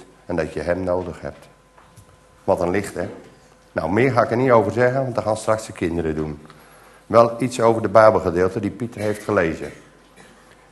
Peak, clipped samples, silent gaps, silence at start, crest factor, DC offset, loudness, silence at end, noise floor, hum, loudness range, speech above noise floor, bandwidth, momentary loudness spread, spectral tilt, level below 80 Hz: 0 dBFS; under 0.1%; none; 0 s; 20 dB; under 0.1%; -20 LUFS; 1 s; -49 dBFS; none; 7 LU; 30 dB; 12.5 kHz; 15 LU; -6.5 dB/octave; -50 dBFS